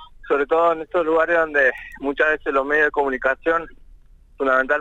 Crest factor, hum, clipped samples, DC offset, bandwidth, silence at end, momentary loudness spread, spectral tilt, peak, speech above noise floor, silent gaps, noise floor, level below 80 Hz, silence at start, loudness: 14 dB; none; under 0.1%; under 0.1%; 8 kHz; 0 s; 7 LU; -5 dB/octave; -6 dBFS; 28 dB; none; -47 dBFS; -46 dBFS; 0 s; -20 LUFS